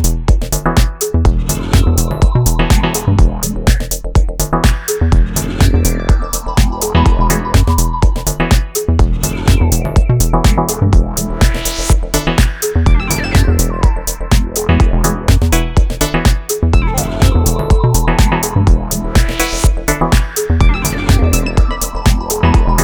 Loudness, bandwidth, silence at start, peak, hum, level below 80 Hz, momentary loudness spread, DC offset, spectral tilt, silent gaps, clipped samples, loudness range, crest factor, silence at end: -14 LUFS; over 20 kHz; 0 s; 0 dBFS; none; -14 dBFS; 3 LU; under 0.1%; -5 dB/octave; none; under 0.1%; 1 LU; 12 dB; 0 s